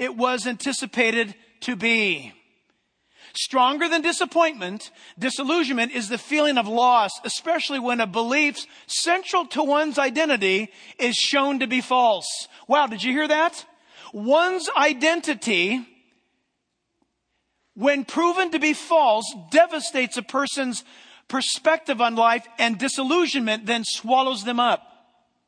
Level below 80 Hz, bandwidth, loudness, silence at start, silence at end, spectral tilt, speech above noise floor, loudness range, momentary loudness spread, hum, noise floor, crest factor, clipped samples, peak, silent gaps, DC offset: -78 dBFS; 10.5 kHz; -22 LUFS; 0 s; 0.7 s; -2.5 dB/octave; 54 dB; 3 LU; 9 LU; none; -76 dBFS; 20 dB; under 0.1%; -4 dBFS; none; under 0.1%